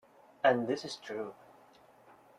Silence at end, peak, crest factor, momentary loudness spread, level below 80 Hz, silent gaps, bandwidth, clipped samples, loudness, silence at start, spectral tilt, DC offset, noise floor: 1.05 s; -12 dBFS; 24 dB; 13 LU; -80 dBFS; none; 13 kHz; under 0.1%; -33 LUFS; 0.45 s; -5 dB/octave; under 0.1%; -61 dBFS